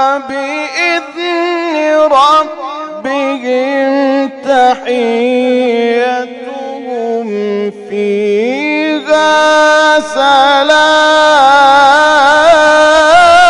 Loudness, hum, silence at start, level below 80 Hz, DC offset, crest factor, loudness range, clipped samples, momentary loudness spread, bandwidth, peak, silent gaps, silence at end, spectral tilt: -9 LUFS; none; 0 s; -48 dBFS; under 0.1%; 10 dB; 8 LU; under 0.1%; 12 LU; 11 kHz; 0 dBFS; none; 0 s; -2.5 dB/octave